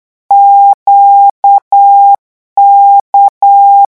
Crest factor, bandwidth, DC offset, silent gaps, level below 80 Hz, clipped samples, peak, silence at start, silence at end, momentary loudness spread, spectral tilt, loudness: 6 dB; 1.5 kHz; 0.3%; 0.74-0.86 s, 1.31-1.43 s, 1.62-1.71 s, 2.18-2.56 s, 3.01-3.13 s, 3.29-3.41 s; -62 dBFS; 1%; 0 dBFS; 0.3 s; 0.1 s; 5 LU; -3.5 dB/octave; -5 LUFS